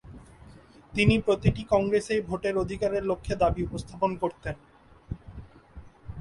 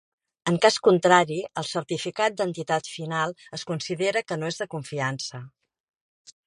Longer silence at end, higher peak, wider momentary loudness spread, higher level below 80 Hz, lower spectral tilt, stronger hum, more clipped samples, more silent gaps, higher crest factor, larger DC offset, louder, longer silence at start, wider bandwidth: second, 0 s vs 1 s; second, -8 dBFS vs -4 dBFS; first, 19 LU vs 13 LU; first, -44 dBFS vs -68 dBFS; first, -6.5 dB/octave vs -4.5 dB/octave; neither; neither; neither; about the same, 20 dB vs 22 dB; neither; about the same, -27 LUFS vs -25 LUFS; second, 0.05 s vs 0.45 s; about the same, 11.5 kHz vs 11.5 kHz